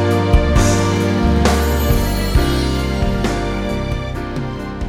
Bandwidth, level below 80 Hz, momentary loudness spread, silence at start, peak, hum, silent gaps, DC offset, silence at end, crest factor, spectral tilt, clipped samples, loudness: 19 kHz; -20 dBFS; 9 LU; 0 s; 0 dBFS; none; none; under 0.1%; 0 s; 16 dB; -5.5 dB/octave; under 0.1%; -17 LUFS